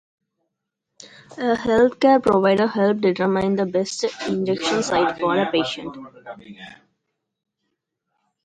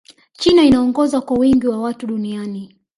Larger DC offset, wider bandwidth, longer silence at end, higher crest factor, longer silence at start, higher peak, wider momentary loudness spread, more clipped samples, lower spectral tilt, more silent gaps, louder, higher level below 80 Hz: neither; about the same, 10.5 kHz vs 11.5 kHz; first, 1.7 s vs 0.3 s; about the same, 18 dB vs 14 dB; first, 1 s vs 0.4 s; about the same, -4 dBFS vs -2 dBFS; first, 23 LU vs 14 LU; neither; about the same, -5 dB/octave vs -5.5 dB/octave; neither; second, -20 LUFS vs -16 LUFS; second, -56 dBFS vs -44 dBFS